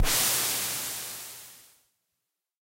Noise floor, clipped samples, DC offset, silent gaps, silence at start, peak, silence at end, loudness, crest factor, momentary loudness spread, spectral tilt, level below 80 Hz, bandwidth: -84 dBFS; under 0.1%; under 0.1%; none; 0 s; -12 dBFS; 1 s; -26 LUFS; 18 dB; 20 LU; -0.5 dB/octave; -40 dBFS; 16 kHz